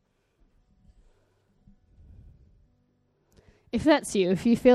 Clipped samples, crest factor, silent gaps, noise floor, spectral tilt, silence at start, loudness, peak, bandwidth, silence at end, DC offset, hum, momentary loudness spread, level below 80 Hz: under 0.1%; 22 dB; none; -69 dBFS; -5.5 dB/octave; 3.75 s; -24 LUFS; -6 dBFS; 13.5 kHz; 0 s; under 0.1%; none; 6 LU; -56 dBFS